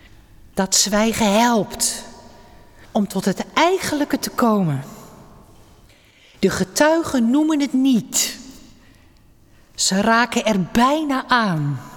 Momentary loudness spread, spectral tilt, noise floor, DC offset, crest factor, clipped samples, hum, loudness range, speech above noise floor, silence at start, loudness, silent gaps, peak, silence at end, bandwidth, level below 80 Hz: 8 LU; -3.5 dB/octave; -50 dBFS; under 0.1%; 16 dB; under 0.1%; none; 2 LU; 32 dB; 0.55 s; -18 LUFS; none; -4 dBFS; 0 s; 19 kHz; -48 dBFS